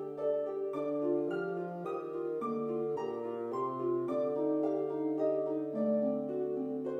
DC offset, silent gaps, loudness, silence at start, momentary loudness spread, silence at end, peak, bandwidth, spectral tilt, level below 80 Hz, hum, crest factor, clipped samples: under 0.1%; none; -35 LUFS; 0 s; 6 LU; 0 s; -22 dBFS; 7.8 kHz; -9 dB/octave; -84 dBFS; none; 12 dB; under 0.1%